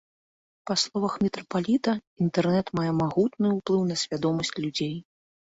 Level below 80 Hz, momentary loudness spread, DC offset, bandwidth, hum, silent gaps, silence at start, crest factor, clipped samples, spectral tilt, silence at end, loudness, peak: -62 dBFS; 5 LU; under 0.1%; 8 kHz; none; 2.07-2.16 s; 0.65 s; 16 dB; under 0.1%; -5.5 dB/octave; 0.55 s; -26 LUFS; -10 dBFS